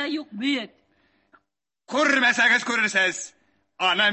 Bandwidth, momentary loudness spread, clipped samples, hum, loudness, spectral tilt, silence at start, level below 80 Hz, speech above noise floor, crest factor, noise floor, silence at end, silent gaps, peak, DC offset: 8.6 kHz; 13 LU; under 0.1%; none; -21 LUFS; -1.5 dB/octave; 0 s; -72 dBFS; 57 dB; 18 dB; -79 dBFS; 0 s; none; -6 dBFS; under 0.1%